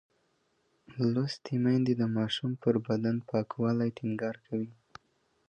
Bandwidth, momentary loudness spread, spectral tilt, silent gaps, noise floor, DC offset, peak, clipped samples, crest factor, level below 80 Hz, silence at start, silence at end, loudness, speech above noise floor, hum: 8.6 kHz; 9 LU; -7.5 dB/octave; none; -73 dBFS; under 0.1%; -14 dBFS; under 0.1%; 18 dB; -70 dBFS; 0.9 s; 0.75 s; -31 LUFS; 43 dB; none